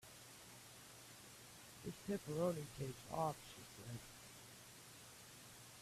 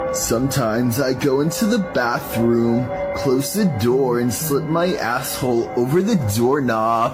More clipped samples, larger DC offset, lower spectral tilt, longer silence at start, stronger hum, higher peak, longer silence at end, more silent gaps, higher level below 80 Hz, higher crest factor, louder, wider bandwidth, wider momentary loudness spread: neither; neither; about the same, -5 dB/octave vs -5.5 dB/octave; about the same, 0 s vs 0 s; neither; second, -28 dBFS vs -6 dBFS; about the same, 0 s vs 0 s; neither; second, -74 dBFS vs -46 dBFS; first, 22 dB vs 12 dB; second, -50 LUFS vs -19 LUFS; about the same, 15.5 kHz vs 16 kHz; first, 15 LU vs 3 LU